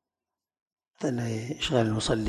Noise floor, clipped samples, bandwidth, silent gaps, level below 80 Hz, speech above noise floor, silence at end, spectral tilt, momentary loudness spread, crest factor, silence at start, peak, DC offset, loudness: under -90 dBFS; under 0.1%; 12.5 kHz; none; -50 dBFS; over 63 dB; 0 s; -5 dB/octave; 7 LU; 20 dB; 1 s; -10 dBFS; under 0.1%; -29 LUFS